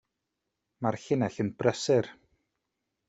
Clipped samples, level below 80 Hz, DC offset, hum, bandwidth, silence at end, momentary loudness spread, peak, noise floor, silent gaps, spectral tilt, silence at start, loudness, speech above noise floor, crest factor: under 0.1%; -68 dBFS; under 0.1%; none; 8.2 kHz; 0.95 s; 7 LU; -8 dBFS; -84 dBFS; none; -6 dB/octave; 0.8 s; -29 LUFS; 56 dB; 24 dB